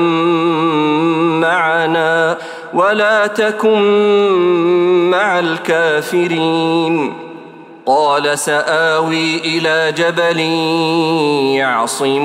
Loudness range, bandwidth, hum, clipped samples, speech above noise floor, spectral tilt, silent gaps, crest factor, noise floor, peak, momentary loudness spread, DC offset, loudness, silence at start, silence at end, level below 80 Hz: 3 LU; 15.5 kHz; none; under 0.1%; 22 dB; -4.5 dB/octave; none; 12 dB; -35 dBFS; -2 dBFS; 4 LU; under 0.1%; -13 LUFS; 0 s; 0 s; -68 dBFS